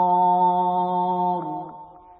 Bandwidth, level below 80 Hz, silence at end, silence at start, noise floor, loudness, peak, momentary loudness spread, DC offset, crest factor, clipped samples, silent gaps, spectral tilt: 4.2 kHz; -68 dBFS; 0.2 s; 0 s; -43 dBFS; -21 LUFS; -10 dBFS; 14 LU; under 0.1%; 12 dB; under 0.1%; none; -12 dB/octave